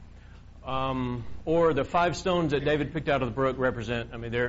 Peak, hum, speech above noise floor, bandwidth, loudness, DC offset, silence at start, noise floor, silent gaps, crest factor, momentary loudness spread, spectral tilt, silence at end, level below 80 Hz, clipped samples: -12 dBFS; none; 21 dB; 7.6 kHz; -28 LUFS; under 0.1%; 0 s; -48 dBFS; none; 16 dB; 9 LU; -5 dB/octave; 0 s; -46 dBFS; under 0.1%